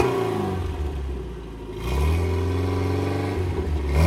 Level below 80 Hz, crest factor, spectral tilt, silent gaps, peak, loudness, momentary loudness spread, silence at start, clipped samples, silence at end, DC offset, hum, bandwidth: -30 dBFS; 18 dB; -7 dB/octave; none; -6 dBFS; -26 LUFS; 10 LU; 0 s; under 0.1%; 0 s; under 0.1%; none; 14 kHz